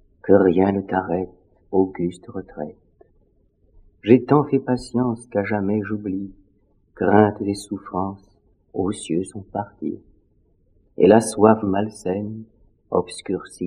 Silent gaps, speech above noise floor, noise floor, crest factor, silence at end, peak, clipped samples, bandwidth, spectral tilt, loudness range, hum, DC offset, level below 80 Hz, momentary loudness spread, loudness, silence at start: none; 40 dB; -61 dBFS; 22 dB; 0 s; 0 dBFS; under 0.1%; 11 kHz; -7 dB/octave; 7 LU; none; under 0.1%; -56 dBFS; 17 LU; -21 LUFS; 0.25 s